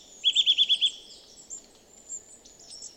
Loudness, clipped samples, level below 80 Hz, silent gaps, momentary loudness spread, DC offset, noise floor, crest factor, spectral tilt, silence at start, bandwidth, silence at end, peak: -21 LUFS; under 0.1%; -70 dBFS; none; 22 LU; under 0.1%; -54 dBFS; 18 dB; 3 dB/octave; 0.2 s; 15.5 kHz; 0.1 s; -12 dBFS